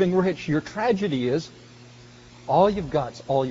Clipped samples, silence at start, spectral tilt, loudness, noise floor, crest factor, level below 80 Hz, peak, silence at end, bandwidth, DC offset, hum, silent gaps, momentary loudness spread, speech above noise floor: under 0.1%; 0 s; -6 dB/octave; -24 LUFS; -47 dBFS; 18 dB; -52 dBFS; -6 dBFS; 0 s; 7.6 kHz; under 0.1%; none; none; 8 LU; 24 dB